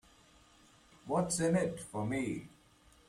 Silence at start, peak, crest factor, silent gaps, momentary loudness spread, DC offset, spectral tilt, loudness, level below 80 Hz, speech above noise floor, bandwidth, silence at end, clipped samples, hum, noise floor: 1.05 s; -18 dBFS; 18 dB; none; 10 LU; under 0.1%; -5.5 dB/octave; -35 LUFS; -64 dBFS; 30 dB; 14 kHz; 0.6 s; under 0.1%; none; -64 dBFS